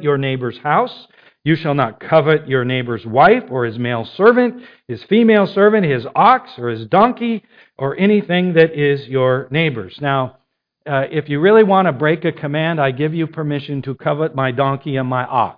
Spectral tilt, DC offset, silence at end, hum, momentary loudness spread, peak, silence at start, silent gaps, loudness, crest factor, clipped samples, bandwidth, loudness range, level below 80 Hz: -10 dB/octave; under 0.1%; 0.05 s; none; 10 LU; 0 dBFS; 0 s; none; -16 LUFS; 16 dB; under 0.1%; 5.2 kHz; 3 LU; -56 dBFS